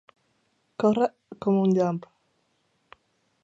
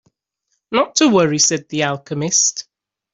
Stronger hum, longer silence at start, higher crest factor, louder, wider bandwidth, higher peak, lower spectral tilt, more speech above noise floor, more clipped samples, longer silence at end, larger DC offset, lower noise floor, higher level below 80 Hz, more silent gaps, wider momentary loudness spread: neither; about the same, 0.8 s vs 0.7 s; about the same, 20 dB vs 16 dB; second, -25 LUFS vs -16 LUFS; about the same, 7.8 kHz vs 8.2 kHz; second, -8 dBFS vs -2 dBFS; first, -8.5 dB/octave vs -3 dB/octave; second, 48 dB vs 55 dB; neither; first, 1.45 s vs 0.5 s; neither; about the same, -71 dBFS vs -72 dBFS; second, -72 dBFS vs -60 dBFS; neither; first, 12 LU vs 8 LU